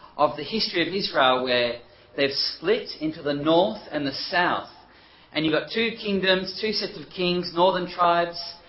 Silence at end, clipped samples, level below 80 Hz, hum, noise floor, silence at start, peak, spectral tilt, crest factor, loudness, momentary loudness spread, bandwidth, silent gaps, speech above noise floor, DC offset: 0.1 s; under 0.1%; -58 dBFS; none; -52 dBFS; 0.05 s; -6 dBFS; -7.5 dB/octave; 20 dB; -24 LUFS; 8 LU; 6 kHz; none; 28 dB; under 0.1%